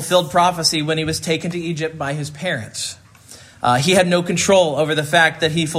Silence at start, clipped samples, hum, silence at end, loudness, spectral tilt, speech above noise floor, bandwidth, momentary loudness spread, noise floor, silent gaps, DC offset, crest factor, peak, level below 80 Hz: 0 s; under 0.1%; none; 0 s; -18 LUFS; -4 dB/octave; 25 dB; 16 kHz; 10 LU; -43 dBFS; none; under 0.1%; 18 dB; 0 dBFS; -52 dBFS